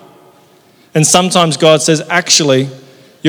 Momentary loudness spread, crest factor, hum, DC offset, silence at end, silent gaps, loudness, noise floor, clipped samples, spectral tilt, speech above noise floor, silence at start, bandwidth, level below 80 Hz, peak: 6 LU; 12 dB; none; under 0.1%; 0 s; none; -10 LUFS; -47 dBFS; 0.4%; -3.5 dB/octave; 36 dB; 0.95 s; over 20 kHz; -56 dBFS; 0 dBFS